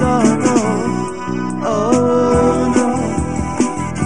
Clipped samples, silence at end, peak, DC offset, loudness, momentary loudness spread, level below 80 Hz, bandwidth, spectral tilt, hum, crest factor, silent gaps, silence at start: under 0.1%; 0 s; 0 dBFS; 2%; -16 LUFS; 8 LU; -34 dBFS; 11 kHz; -6 dB/octave; none; 14 dB; none; 0 s